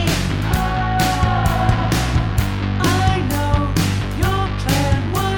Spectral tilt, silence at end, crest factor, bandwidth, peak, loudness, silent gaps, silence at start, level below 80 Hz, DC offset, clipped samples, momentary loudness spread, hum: -5.5 dB/octave; 0 s; 16 dB; over 20 kHz; -2 dBFS; -18 LUFS; none; 0 s; -26 dBFS; under 0.1%; under 0.1%; 3 LU; none